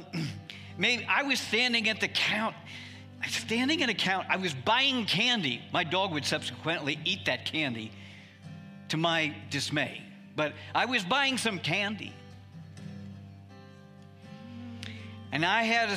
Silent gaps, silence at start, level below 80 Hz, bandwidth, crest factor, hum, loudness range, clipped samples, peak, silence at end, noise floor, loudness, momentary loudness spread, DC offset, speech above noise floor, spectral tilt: none; 0 s; -74 dBFS; 15.5 kHz; 20 dB; none; 8 LU; under 0.1%; -10 dBFS; 0 s; -51 dBFS; -28 LUFS; 21 LU; under 0.1%; 22 dB; -3.5 dB/octave